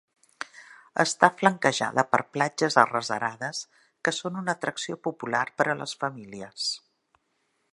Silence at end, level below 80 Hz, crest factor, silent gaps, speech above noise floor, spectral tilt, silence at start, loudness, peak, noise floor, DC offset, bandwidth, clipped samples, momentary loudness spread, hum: 0.95 s; -72 dBFS; 28 dB; none; 47 dB; -3.5 dB/octave; 0.4 s; -26 LUFS; 0 dBFS; -74 dBFS; under 0.1%; 11.5 kHz; under 0.1%; 18 LU; none